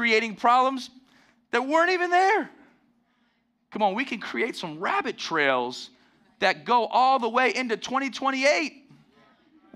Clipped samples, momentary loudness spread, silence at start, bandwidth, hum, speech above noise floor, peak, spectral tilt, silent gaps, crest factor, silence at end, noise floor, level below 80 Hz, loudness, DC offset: under 0.1%; 12 LU; 0 s; 12.5 kHz; none; 46 dB; -8 dBFS; -3 dB/octave; none; 18 dB; 1.05 s; -70 dBFS; -76 dBFS; -24 LUFS; under 0.1%